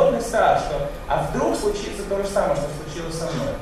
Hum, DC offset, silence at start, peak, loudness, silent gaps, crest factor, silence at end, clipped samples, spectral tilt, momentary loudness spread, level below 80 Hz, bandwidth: none; under 0.1%; 0 s; -6 dBFS; -23 LUFS; none; 16 dB; 0 s; under 0.1%; -5 dB/octave; 9 LU; -36 dBFS; 14 kHz